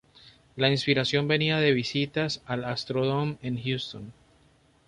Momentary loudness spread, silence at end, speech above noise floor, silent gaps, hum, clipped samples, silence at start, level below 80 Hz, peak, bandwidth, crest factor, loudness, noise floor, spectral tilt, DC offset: 11 LU; 0.75 s; 35 dB; none; none; under 0.1%; 0.25 s; -60 dBFS; -8 dBFS; 10.5 kHz; 20 dB; -26 LUFS; -62 dBFS; -5.5 dB/octave; under 0.1%